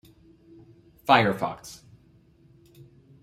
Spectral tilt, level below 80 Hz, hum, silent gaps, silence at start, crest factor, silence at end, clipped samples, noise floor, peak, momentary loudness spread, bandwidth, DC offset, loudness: -5 dB/octave; -62 dBFS; none; none; 1.1 s; 26 dB; 1.5 s; under 0.1%; -58 dBFS; -4 dBFS; 24 LU; 16 kHz; under 0.1%; -23 LUFS